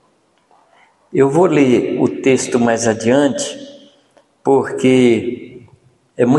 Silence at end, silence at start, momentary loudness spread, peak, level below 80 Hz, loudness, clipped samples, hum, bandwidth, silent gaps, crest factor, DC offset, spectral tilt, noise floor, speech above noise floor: 0 s; 1.15 s; 11 LU; 0 dBFS; -56 dBFS; -15 LUFS; under 0.1%; none; 11.5 kHz; none; 14 dB; under 0.1%; -5.5 dB/octave; -58 dBFS; 44 dB